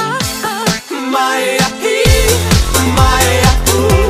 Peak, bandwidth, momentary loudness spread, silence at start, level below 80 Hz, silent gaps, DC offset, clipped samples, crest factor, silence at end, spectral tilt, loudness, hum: 0 dBFS; 16 kHz; 6 LU; 0 s; -18 dBFS; none; under 0.1%; 0.1%; 12 dB; 0 s; -4 dB/octave; -12 LUFS; none